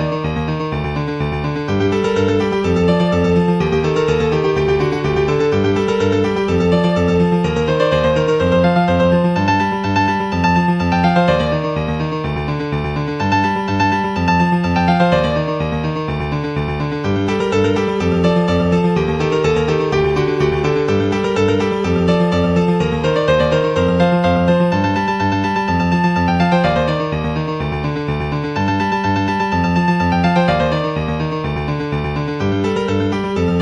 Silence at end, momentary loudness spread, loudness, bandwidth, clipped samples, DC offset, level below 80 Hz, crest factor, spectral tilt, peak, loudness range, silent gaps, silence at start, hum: 0 s; 6 LU; -16 LUFS; 8.6 kHz; under 0.1%; under 0.1%; -34 dBFS; 14 dB; -7 dB/octave; -2 dBFS; 3 LU; none; 0 s; none